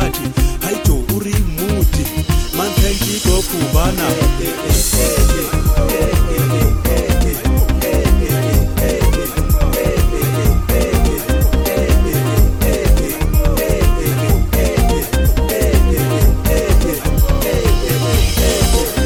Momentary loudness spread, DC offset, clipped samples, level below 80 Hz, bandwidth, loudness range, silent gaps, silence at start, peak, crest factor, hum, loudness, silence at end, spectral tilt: 3 LU; under 0.1%; under 0.1%; -16 dBFS; 20 kHz; 1 LU; none; 0 s; 0 dBFS; 12 dB; none; -15 LUFS; 0 s; -5 dB/octave